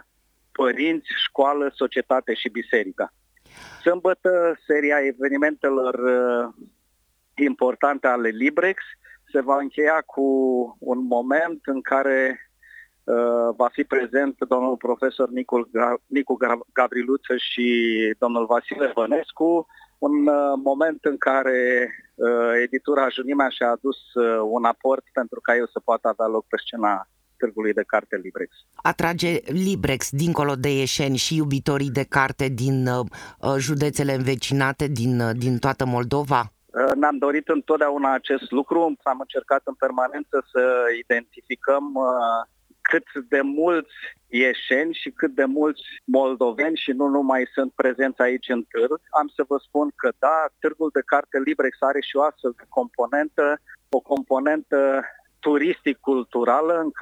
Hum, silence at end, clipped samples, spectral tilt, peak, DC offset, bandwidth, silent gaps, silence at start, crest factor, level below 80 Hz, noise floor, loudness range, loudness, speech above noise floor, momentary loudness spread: none; 0 s; under 0.1%; -5.5 dB/octave; -2 dBFS; under 0.1%; 16.5 kHz; none; 0.6 s; 20 dB; -58 dBFS; -67 dBFS; 2 LU; -22 LUFS; 45 dB; 6 LU